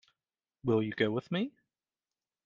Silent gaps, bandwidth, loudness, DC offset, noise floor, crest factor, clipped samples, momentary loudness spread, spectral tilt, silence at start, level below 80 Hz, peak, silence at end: none; 7.2 kHz; -33 LUFS; under 0.1%; under -90 dBFS; 22 dB; under 0.1%; 8 LU; -5.5 dB/octave; 0.65 s; -70 dBFS; -14 dBFS; 0.95 s